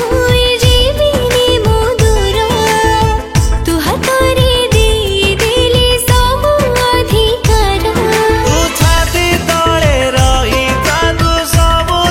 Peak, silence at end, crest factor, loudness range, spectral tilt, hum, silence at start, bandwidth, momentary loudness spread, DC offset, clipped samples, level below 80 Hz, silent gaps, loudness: 0 dBFS; 0 s; 10 dB; 1 LU; -4 dB/octave; none; 0 s; 17 kHz; 3 LU; under 0.1%; under 0.1%; -16 dBFS; none; -11 LUFS